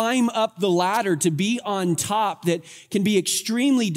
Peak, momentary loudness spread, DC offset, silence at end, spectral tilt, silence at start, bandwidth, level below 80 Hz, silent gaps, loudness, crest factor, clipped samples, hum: -8 dBFS; 5 LU; under 0.1%; 0 s; -4.5 dB/octave; 0 s; 16 kHz; -70 dBFS; none; -22 LUFS; 14 dB; under 0.1%; none